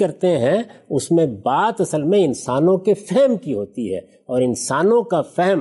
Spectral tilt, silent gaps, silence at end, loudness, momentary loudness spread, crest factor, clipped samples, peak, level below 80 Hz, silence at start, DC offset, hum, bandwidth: -6 dB/octave; none; 0 s; -19 LUFS; 8 LU; 12 dB; under 0.1%; -6 dBFS; -62 dBFS; 0 s; under 0.1%; none; 11.5 kHz